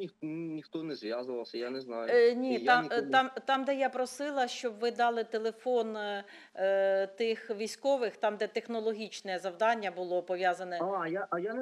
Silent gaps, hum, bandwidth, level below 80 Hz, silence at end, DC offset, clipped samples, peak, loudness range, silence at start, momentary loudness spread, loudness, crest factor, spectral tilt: none; none; 12.5 kHz; -88 dBFS; 0 s; under 0.1%; under 0.1%; -12 dBFS; 4 LU; 0 s; 11 LU; -32 LUFS; 20 dB; -4 dB/octave